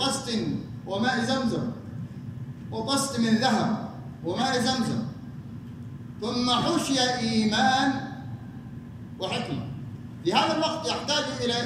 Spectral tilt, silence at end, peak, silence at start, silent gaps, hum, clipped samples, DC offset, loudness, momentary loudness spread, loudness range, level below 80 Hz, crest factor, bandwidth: -4 dB/octave; 0 s; -8 dBFS; 0 s; none; none; under 0.1%; under 0.1%; -26 LUFS; 17 LU; 3 LU; -58 dBFS; 18 dB; 15.5 kHz